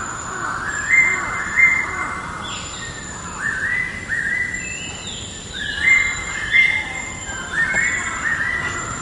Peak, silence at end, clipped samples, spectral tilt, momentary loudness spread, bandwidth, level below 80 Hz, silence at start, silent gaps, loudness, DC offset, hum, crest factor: -2 dBFS; 0 s; under 0.1%; -1.5 dB/octave; 14 LU; 11.5 kHz; -42 dBFS; 0 s; none; -19 LUFS; under 0.1%; none; 18 dB